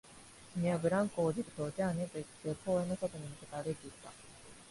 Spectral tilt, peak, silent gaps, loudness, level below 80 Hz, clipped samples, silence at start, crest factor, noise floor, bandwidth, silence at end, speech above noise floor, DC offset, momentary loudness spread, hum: -6.5 dB/octave; -20 dBFS; none; -37 LUFS; -66 dBFS; under 0.1%; 0.05 s; 16 dB; -56 dBFS; 11.5 kHz; 0 s; 20 dB; under 0.1%; 21 LU; none